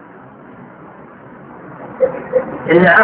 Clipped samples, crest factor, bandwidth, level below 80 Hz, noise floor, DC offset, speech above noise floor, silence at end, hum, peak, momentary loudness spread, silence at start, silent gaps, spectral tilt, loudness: under 0.1%; 16 dB; 5 kHz; -52 dBFS; -38 dBFS; under 0.1%; 26 dB; 0 s; none; 0 dBFS; 26 LU; 0.6 s; none; -10 dB/octave; -15 LUFS